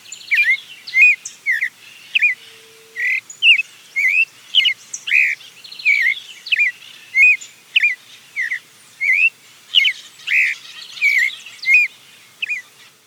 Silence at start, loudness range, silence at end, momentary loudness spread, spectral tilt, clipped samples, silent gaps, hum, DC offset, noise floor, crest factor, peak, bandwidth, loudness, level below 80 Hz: 0.1 s; 2 LU; 0.45 s; 14 LU; 3.5 dB/octave; under 0.1%; none; none; under 0.1%; -45 dBFS; 16 dB; -2 dBFS; 19 kHz; -15 LUFS; under -90 dBFS